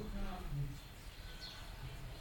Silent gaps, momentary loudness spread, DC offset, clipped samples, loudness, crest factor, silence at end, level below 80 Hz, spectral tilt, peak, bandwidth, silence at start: none; 8 LU; under 0.1%; under 0.1%; -48 LUFS; 14 dB; 0 s; -48 dBFS; -5.5 dB/octave; -30 dBFS; 17 kHz; 0 s